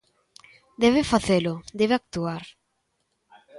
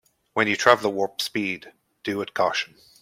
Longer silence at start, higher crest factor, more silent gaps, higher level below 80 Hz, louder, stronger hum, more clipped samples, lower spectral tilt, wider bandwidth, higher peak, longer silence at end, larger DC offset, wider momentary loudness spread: first, 0.8 s vs 0.35 s; about the same, 20 dB vs 24 dB; neither; first, -52 dBFS vs -68 dBFS; about the same, -23 LUFS vs -23 LUFS; neither; neither; first, -5.5 dB/octave vs -3.5 dB/octave; second, 11.5 kHz vs 16.5 kHz; second, -6 dBFS vs -2 dBFS; second, 0 s vs 0.35 s; neither; second, 10 LU vs 14 LU